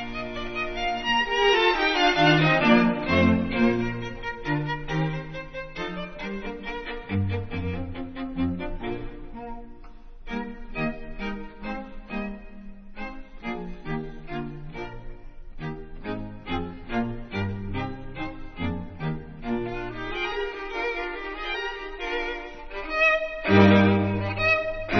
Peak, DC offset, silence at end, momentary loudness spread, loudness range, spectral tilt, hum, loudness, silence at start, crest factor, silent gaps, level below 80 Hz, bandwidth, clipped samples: -2 dBFS; 0.2%; 0 s; 18 LU; 15 LU; -6.5 dB/octave; none; -26 LUFS; 0 s; 24 dB; none; -40 dBFS; 6.6 kHz; under 0.1%